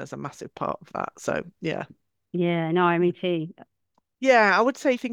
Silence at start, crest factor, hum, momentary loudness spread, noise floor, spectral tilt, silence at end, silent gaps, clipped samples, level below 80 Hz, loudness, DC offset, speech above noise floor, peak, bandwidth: 0 s; 20 dB; none; 17 LU; -73 dBFS; -6 dB/octave; 0 s; none; under 0.1%; -66 dBFS; -24 LUFS; under 0.1%; 49 dB; -4 dBFS; 12 kHz